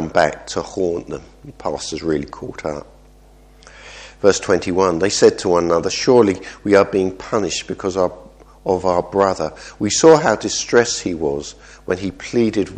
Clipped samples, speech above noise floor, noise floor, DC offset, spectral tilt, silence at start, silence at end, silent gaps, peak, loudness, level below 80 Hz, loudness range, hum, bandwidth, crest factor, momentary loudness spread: under 0.1%; 29 dB; -46 dBFS; under 0.1%; -4 dB/octave; 0 s; 0 s; none; 0 dBFS; -18 LUFS; -46 dBFS; 9 LU; none; 9.8 kHz; 18 dB; 14 LU